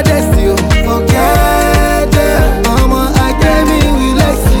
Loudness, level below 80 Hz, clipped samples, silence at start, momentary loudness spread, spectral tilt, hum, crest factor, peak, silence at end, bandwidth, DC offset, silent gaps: -10 LUFS; -14 dBFS; under 0.1%; 0 s; 2 LU; -5.5 dB/octave; none; 8 dB; 0 dBFS; 0 s; 18.5 kHz; under 0.1%; none